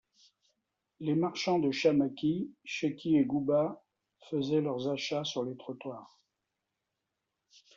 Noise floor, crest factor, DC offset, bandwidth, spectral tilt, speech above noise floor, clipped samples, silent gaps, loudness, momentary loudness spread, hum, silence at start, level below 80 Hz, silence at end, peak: -86 dBFS; 20 dB; under 0.1%; 7.4 kHz; -5 dB/octave; 55 dB; under 0.1%; none; -32 LUFS; 14 LU; none; 1 s; -74 dBFS; 1.7 s; -14 dBFS